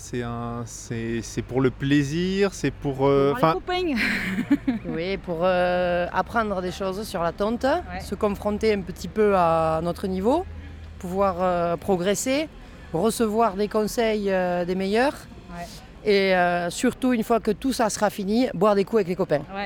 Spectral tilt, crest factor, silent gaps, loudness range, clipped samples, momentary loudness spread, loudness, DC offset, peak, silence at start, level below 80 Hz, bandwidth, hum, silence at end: -5.5 dB/octave; 18 dB; none; 2 LU; under 0.1%; 10 LU; -24 LUFS; under 0.1%; -6 dBFS; 0 s; -44 dBFS; 18.5 kHz; none; 0 s